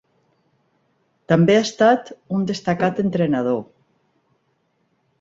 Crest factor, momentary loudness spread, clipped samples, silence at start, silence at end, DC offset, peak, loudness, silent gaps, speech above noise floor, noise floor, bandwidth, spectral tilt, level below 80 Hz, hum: 20 dB; 9 LU; under 0.1%; 1.3 s; 1.55 s; under 0.1%; -2 dBFS; -19 LUFS; none; 49 dB; -67 dBFS; 7.8 kHz; -6.5 dB/octave; -58 dBFS; none